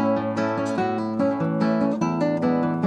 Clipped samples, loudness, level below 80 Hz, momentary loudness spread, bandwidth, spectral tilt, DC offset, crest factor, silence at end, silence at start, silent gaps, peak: under 0.1%; -23 LUFS; -64 dBFS; 3 LU; 9 kHz; -7.5 dB/octave; under 0.1%; 12 dB; 0 s; 0 s; none; -10 dBFS